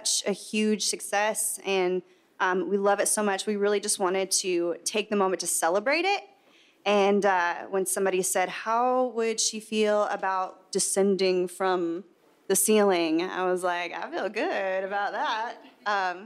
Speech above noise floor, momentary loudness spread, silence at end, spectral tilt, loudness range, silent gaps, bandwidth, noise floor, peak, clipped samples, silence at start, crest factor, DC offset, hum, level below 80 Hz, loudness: 34 dB; 6 LU; 0 s; -2.5 dB/octave; 1 LU; none; 15.5 kHz; -60 dBFS; -10 dBFS; under 0.1%; 0 s; 16 dB; under 0.1%; none; -86 dBFS; -26 LUFS